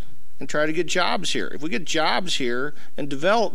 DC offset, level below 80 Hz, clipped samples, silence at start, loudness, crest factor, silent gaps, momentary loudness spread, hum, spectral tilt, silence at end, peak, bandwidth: 8%; -54 dBFS; under 0.1%; 0 s; -24 LUFS; 18 dB; none; 10 LU; none; -3 dB/octave; 0 s; -8 dBFS; 16 kHz